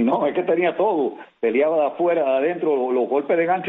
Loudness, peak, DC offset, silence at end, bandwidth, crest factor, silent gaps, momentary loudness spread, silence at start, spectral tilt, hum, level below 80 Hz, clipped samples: -21 LUFS; -6 dBFS; under 0.1%; 0 s; 4 kHz; 14 dB; none; 3 LU; 0 s; -8.5 dB/octave; none; -68 dBFS; under 0.1%